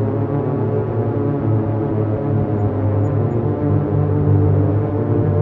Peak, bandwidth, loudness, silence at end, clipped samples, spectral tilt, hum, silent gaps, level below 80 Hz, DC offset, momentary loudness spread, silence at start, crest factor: -4 dBFS; 3.1 kHz; -18 LUFS; 0 s; under 0.1%; -12.5 dB/octave; none; none; -40 dBFS; under 0.1%; 4 LU; 0 s; 12 dB